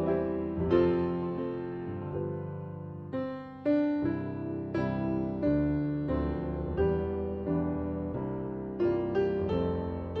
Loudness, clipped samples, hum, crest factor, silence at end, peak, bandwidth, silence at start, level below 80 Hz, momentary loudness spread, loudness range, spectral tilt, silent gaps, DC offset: -32 LUFS; under 0.1%; none; 18 dB; 0 s; -12 dBFS; 5.8 kHz; 0 s; -46 dBFS; 9 LU; 3 LU; -10.5 dB/octave; none; under 0.1%